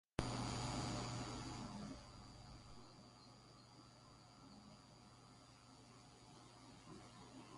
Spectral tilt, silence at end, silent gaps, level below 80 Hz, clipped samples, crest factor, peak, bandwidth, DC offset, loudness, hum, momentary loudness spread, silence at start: -4.5 dB/octave; 0 s; none; -64 dBFS; under 0.1%; 30 dB; -22 dBFS; 11.5 kHz; under 0.1%; -50 LUFS; none; 19 LU; 0.2 s